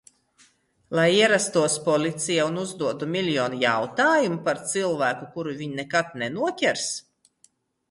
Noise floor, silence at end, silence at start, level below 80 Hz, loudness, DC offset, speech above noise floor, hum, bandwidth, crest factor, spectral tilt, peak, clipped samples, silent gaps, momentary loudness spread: -63 dBFS; 0.9 s; 0.9 s; -68 dBFS; -24 LUFS; under 0.1%; 39 dB; none; 11.5 kHz; 18 dB; -3.5 dB/octave; -6 dBFS; under 0.1%; none; 10 LU